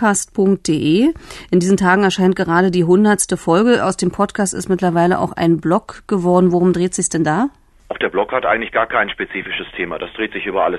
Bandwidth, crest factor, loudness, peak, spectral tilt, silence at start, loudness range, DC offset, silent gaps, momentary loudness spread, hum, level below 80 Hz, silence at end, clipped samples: 12.5 kHz; 16 dB; -16 LUFS; 0 dBFS; -5 dB/octave; 0 s; 4 LU; under 0.1%; none; 10 LU; none; -46 dBFS; 0 s; under 0.1%